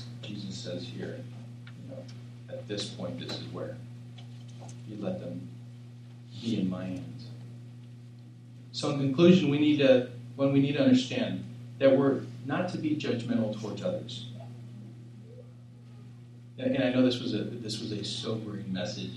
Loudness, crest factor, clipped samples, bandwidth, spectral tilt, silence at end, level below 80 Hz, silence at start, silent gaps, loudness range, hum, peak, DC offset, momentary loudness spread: -29 LUFS; 22 dB; under 0.1%; 11 kHz; -6.5 dB/octave; 0 s; -72 dBFS; 0 s; none; 14 LU; none; -8 dBFS; under 0.1%; 24 LU